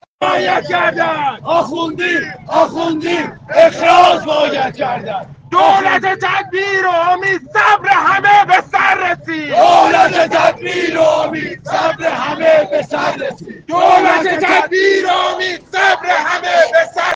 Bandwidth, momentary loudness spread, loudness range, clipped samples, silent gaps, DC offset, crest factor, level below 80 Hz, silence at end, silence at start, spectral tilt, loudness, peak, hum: 9.4 kHz; 9 LU; 4 LU; under 0.1%; none; under 0.1%; 12 dB; -54 dBFS; 0 s; 0.2 s; -4 dB/octave; -12 LUFS; 0 dBFS; none